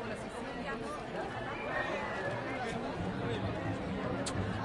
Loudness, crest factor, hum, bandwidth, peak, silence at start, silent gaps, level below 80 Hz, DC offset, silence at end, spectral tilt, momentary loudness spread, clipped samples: -37 LUFS; 16 dB; none; 11.5 kHz; -22 dBFS; 0 s; none; -54 dBFS; under 0.1%; 0 s; -5.5 dB/octave; 4 LU; under 0.1%